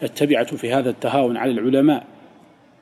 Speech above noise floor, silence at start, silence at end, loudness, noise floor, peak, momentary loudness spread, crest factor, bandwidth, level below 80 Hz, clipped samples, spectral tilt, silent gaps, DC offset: 31 dB; 0 s; 0.8 s; -19 LUFS; -50 dBFS; -4 dBFS; 4 LU; 16 dB; 14 kHz; -68 dBFS; under 0.1%; -6 dB/octave; none; under 0.1%